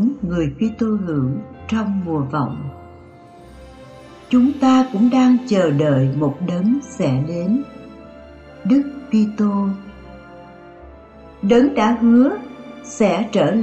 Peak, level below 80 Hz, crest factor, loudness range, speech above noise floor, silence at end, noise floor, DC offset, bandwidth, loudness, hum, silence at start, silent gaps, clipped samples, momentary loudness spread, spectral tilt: -4 dBFS; -48 dBFS; 14 dB; 6 LU; 25 dB; 0 s; -42 dBFS; under 0.1%; 8.2 kHz; -18 LUFS; none; 0 s; none; under 0.1%; 18 LU; -7.5 dB/octave